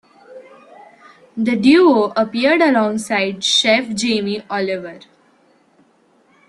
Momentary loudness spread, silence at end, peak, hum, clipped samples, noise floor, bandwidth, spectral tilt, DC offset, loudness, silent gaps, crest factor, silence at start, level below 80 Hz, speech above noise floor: 11 LU; 1.5 s; -2 dBFS; none; under 0.1%; -56 dBFS; 12.5 kHz; -3.5 dB/octave; under 0.1%; -16 LUFS; none; 16 dB; 0.3 s; -62 dBFS; 40 dB